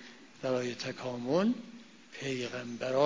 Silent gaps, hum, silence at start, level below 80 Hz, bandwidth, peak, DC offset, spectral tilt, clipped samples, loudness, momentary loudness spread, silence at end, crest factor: none; none; 0 s; -72 dBFS; 7.6 kHz; -14 dBFS; under 0.1%; -5.5 dB/octave; under 0.1%; -35 LUFS; 20 LU; 0 s; 20 dB